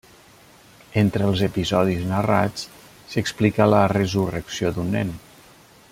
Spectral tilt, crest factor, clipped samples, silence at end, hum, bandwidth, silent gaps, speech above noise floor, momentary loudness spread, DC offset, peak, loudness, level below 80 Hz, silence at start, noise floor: -6.5 dB/octave; 20 dB; under 0.1%; 0.75 s; none; 16 kHz; none; 30 dB; 11 LU; under 0.1%; -2 dBFS; -22 LUFS; -50 dBFS; 0.95 s; -50 dBFS